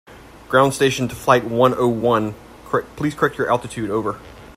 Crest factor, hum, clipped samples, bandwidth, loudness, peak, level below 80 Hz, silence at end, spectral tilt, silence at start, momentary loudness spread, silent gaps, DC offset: 20 dB; none; under 0.1%; 16 kHz; -19 LUFS; 0 dBFS; -48 dBFS; 0.05 s; -5.5 dB/octave; 0.1 s; 9 LU; none; under 0.1%